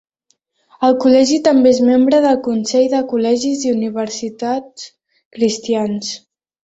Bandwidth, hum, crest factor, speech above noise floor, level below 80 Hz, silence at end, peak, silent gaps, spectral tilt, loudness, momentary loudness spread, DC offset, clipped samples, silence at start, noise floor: 8 kHz; none; 14 dB; 50 dB; -58 dBFS; 0.5 s; -2 dBFS; 5.25-5.31 s; -4.5 dB/octave; -15 LUFS; 12 LU; under 0.1%; under 0.1%; 0.8 s; -64 dBFS